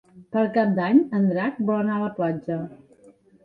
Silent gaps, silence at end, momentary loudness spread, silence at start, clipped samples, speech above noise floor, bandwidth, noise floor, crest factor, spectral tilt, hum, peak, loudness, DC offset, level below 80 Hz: none; 0.7 s; 11 LU; 0.15 s; under 0.1%; 32 dB; 4.8 kHz; -54 dBFS; 18 dB; -10 dB/octave; none; -6 dBFS; -23 LUFS; under 0.1%; -66 dBFS